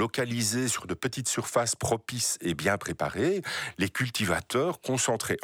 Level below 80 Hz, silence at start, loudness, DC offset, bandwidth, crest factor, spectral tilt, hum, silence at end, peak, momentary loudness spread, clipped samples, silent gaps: -58 dBFS; 0 s; -28 LUFS; under 0.1%; 19.5 kHz; 18 dB; -3.5 dB/octave; none; 0 s; -12 dBFS; 4 LU; under 0.1%; none